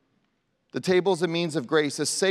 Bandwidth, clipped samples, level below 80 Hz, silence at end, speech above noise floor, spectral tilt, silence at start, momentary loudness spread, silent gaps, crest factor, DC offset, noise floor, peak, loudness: 14 kHz; under 0.1%; -76 dBFS; 0 s; 48 dB; -4 dB/octave; 0.75 s; 7 LU; none; 16 dB; under 0.1%; -72 dBFS; -10 dBFS; -25 LUFS